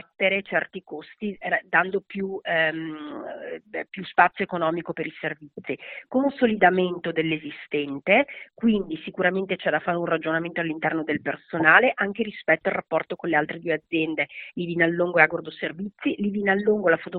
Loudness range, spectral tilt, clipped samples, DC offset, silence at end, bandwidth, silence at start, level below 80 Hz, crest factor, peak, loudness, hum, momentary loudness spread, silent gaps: 4 LU; -3.5 dB/octave; under 0.1%; under 0.1%; 0 s; 4.5 kHz; 0.2 s; -64 dBFS; 24 dB; 0 dBFS; -24 LUFS; none; 14 LU; none